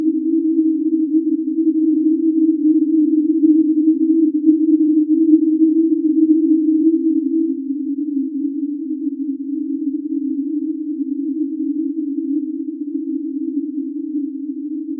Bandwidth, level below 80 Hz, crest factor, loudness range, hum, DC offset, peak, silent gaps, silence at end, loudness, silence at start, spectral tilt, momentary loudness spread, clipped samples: 0.4 kHz; under -90 dBFS; 16 dB; 8 LU; none; under 0.1%; -2 dBFS; none; 0 s; -18 LUFS; 0 s; -14.5 dB/octave; 10 LU; under 0.1%